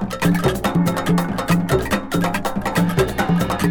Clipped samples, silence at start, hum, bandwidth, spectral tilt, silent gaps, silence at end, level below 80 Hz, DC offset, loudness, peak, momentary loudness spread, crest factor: under 0.1%; 0 s; none; 19.5 kHz; -6 dB/octave; none; 0 s; -36 dBFS; under 0.1%; -19 LUFS; -4 dBFS; 3 LU; 16 dB